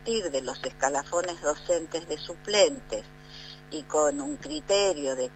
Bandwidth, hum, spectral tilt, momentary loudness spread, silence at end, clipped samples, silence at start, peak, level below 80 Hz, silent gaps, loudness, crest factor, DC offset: 9.2 kHz; none; -2 dB/octave; 15 LU; 0 s; under 0.1%; 0 s; -8 dBFS; -54 dBFS; none; -28 LUFS; 20 dB; under 0.1%